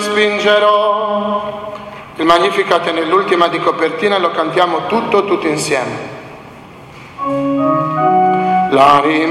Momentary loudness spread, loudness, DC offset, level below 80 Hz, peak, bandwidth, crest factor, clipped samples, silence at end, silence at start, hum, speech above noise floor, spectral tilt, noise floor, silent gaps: 15 LU; -13 LUFS; under 0.1%; -52 dBFS; 0 dBFS; 14.5 kHz; 14 dB; under 0.1%; 0 s; 0 s; none; 22 dB; -4.5 dB/octave; -35 dBFS; none